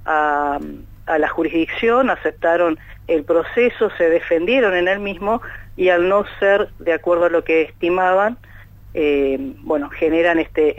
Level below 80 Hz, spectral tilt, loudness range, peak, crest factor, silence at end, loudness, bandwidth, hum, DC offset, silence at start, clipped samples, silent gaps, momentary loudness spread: -42 dBFS; -6.5 dB/octave; 2 LU; -4 dBFS; 14 dB; 0 s; -18 LUFS; 14 kHz; none; under 0.1%; 0 s; under 0.1%; none; 7 LU